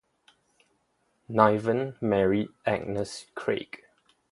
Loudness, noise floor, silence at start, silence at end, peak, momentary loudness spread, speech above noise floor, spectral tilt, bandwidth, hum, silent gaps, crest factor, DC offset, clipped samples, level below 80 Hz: -27 LUFS; -72 dBFS; 1.3 s; 0.55 s; -4 dBFS; 12 LU; 46 dB; -6.5 dB/octave; 11.5 kHz; none; none; 26 dB; under 0.1%; under 0.1%; -60 dBFS